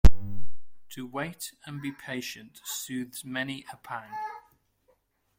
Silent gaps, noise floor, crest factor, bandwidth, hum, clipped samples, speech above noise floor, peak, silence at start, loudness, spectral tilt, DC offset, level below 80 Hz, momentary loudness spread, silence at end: none; -69 dBFS; 22 dB; 16.5 kHz; none; under 0.1%; 33 dB; -4 dBFS; 0.05 s; -35 LUFS; -4.5 dB/octave; under 0.1%; -34 dBFS; 9 LU; 1 s